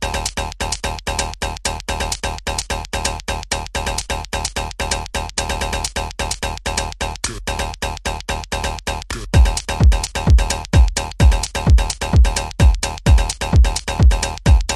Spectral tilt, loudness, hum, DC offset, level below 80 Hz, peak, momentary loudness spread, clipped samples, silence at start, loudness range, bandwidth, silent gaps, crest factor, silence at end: -4 dB/octave; -19 LUFS; none; under 0.1%; -18 dBFS; -2 dBFS; 8 LU; under 0.1%; 0 s; 7 LU; 13.5 kHz; none; 16 dB; 0 s